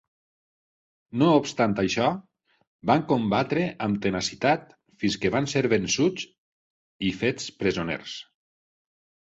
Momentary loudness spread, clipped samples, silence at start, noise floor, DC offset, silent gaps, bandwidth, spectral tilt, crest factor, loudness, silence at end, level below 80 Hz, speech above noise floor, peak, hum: 11 LU; under 0.1%; 1.15 s; under -90 dBFS; under 0.1%; 2.67-2.79 s, 6.38-6.99 s; 8.2 kHz; -5 dB/octave; 20 dB; -25 LUFS; 1.05 s; -56 dBFS; over 66 dB; -8 dBFS; none